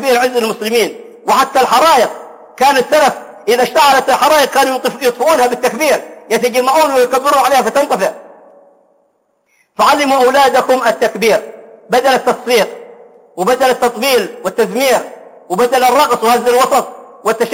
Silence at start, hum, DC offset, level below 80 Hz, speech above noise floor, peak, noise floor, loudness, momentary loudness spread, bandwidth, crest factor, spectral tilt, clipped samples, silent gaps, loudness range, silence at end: 0 s; none; under 0.1%; -54 dBFS; 48 dB; 0 dBFS; -60 dBFS; -12 LUFS; 9 LU; 17 kHz; 12 dB; -2.5 dB/octave; under 0.1%; none; 3 LU; 0 s